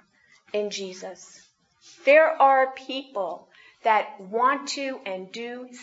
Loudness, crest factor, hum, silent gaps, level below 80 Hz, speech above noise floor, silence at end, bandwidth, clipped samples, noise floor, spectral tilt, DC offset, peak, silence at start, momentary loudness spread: -24 LUFS; 20 dB; none; none; -84 dBFS; 35 dB; 0 s; 8 kHz; under 0.1%; -60 dBFS; -2.5 dB/octave; under 0.1%; -4 dBFS; 0.55 s; 19 LU